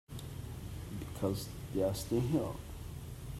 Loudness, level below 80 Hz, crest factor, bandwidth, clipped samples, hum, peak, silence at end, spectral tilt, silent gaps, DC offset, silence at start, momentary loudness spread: -38 LUFS; -50 dBFS; 18 dB; 16 kHz; under 0.1%; none; -20 dBFS; 0 s; -6.5 dB/octave; none; under 0.1%; 0.1 s; 13 LU